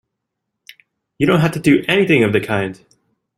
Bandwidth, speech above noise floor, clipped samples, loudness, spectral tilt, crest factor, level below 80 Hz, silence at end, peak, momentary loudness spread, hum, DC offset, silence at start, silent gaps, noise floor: 14.5 kHz; 63 dB; under 0.1%; -15 LUFS; -6.5 dB/octave; 18 dB; -52 dBFS; 0.65 s; 0 dBFS; 8 LU; none; under 0.1%; 1.2 s; none; -77 dBFS